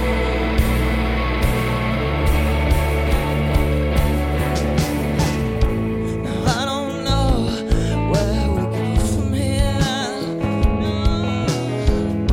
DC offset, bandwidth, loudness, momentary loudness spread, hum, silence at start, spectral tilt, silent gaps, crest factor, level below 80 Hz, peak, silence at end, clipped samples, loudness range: under 0.1%; 17 kHz; -20 LUFS; 2 LU; none; 0 s; -6 dB/octave; none; 14 dB; -22 dBFS; -4 dBFS; 0 s; under 0.1%; 1 LU